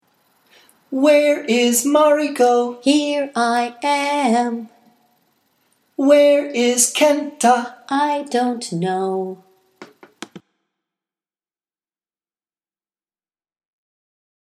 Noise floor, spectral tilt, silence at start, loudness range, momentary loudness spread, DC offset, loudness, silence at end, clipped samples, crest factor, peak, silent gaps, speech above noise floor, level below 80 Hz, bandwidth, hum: under -90 dBFS; -3 dB/octave; 0.9 s; 9 LU; 12 LU; under 0.1%; -17 LUFS; 4.05 s; under 0.1%; 20 dB; 0 dBFS; none; over 73 dB; -76 dBFS; 15.5 kHz; none